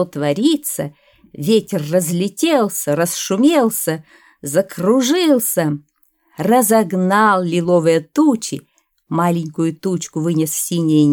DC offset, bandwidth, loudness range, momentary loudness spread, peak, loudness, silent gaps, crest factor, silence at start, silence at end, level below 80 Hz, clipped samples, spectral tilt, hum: under 0.1%; 19.5 kHz; 2 LU; 10 LU; -2 dBFS; -16 LUFS; none; 14 dB; 0 s; 0 s; -64 dBFS; under 0.1%; -5 dB/octave; none